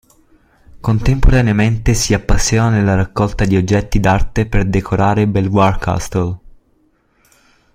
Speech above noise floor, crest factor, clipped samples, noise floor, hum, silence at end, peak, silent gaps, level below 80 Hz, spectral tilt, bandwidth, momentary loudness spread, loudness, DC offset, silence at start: 44 dB; 14 dB; under 0.1%; -57 dBFS; none; 1.4 s; 0 dBFS; none; -22 dBFS; -6 dB/octave; 15.5 kHz; 6 LU; -15 LUFS; under 0.1%; 0.75 s